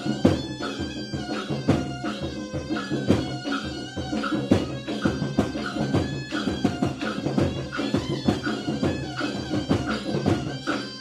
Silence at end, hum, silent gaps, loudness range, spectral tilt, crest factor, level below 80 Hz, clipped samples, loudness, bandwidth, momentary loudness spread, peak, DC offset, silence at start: 0 s; none; none; 2 LU; -6 dB/octave; 22 dB; -46 dBFS; under 0.1%; -27 LUFS; 13.5 kHz; 6 LU; -4 dBFS; under 0.1%; 0 s